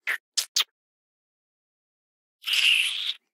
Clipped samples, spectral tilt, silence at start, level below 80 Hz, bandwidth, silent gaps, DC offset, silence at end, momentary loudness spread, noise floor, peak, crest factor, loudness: under 0.1%; 7.5 dB/octave; 0.05 s; under -90 dBFS; 18 kHz; 0.20-0.32 s, 0.48-0.55 s, 0.71-2.39 s; under 0.1%; 0.15 s; 11 LU; under -90 dBFS; -8 dBFS; 22 dB; -23 LUFS